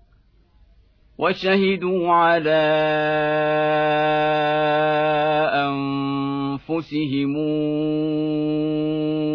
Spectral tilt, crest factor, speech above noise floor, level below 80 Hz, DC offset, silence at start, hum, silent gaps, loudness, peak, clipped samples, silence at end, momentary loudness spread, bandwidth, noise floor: -8 dB/octave; 14 dB; 37 dB; -56 dBFS; under 0.1%; 1.2 s; none; none; -20 LUFS; -8 dBFS; under 0.1%; 0 s; 6 LU; 5.4 kHz; -56 dBFS